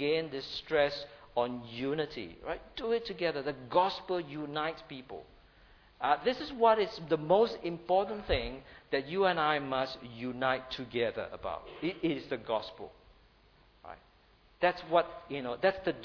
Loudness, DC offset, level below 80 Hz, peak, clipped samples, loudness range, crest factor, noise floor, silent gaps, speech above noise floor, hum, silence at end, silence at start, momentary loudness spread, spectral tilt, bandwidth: -33 LUFS; under 0.1%; -56 dBFS; -12 dBFS; under 0.1%; 6 LU; 22 dB; -64 dBFS; none; 31 dB; none; 0 s; 0 s; 14 LU; -6.5 dB/octave; 5.4 kHz